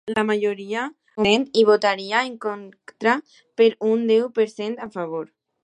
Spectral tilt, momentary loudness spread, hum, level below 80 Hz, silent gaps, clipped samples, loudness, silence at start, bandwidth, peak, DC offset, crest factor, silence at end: -4.5 dB/octave; 13 LU; none; -62 dBFS; none; under 0.1%; -21 LUFS; 0.05 s; 9.6 kHz; -4 dBFS; under 0.1%; 18 dB; 0.4 s